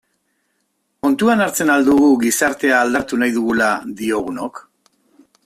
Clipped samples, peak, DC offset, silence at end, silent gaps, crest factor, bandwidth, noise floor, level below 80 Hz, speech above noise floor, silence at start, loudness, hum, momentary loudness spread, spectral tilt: under 0.1%; -2 dBFS; under 0.1%; 0.85 s; none; 14 dB; 16 kHz; -68 dBFS; -54 dBFS; 53 dB; 1.05 s; -16 LUFS; none; 9 LU; -4 dB/octave